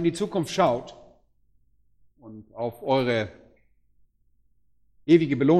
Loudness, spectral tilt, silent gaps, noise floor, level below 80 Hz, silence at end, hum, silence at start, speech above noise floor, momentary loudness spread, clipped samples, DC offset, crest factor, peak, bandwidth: -24 LUFS; -6.5 dB/octave; none; -69 dBFS; -62 dBFS; 0 s; none; 0 s; 47 dB; 17 LU; under 0.1%; under 0.1%; 20 dB; -6 dBFS; 13 kHz